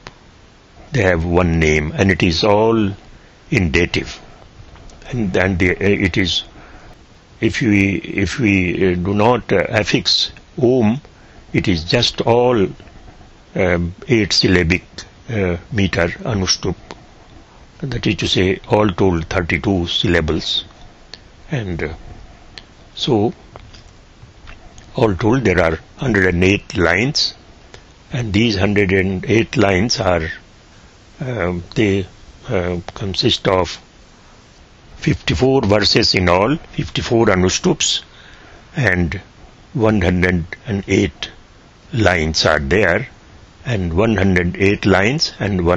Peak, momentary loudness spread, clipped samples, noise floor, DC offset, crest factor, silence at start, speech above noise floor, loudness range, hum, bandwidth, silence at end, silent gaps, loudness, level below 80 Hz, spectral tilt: 0 dBFS; 11 LU; under 0.1%; -45 dBFS; under 0.1%; 18 dB; 0.05 s; 29 dB; 5 LU; none; 8.2 kHz; 0 s; none; -16 LUFS; -36 dBFS; -5 dB/octave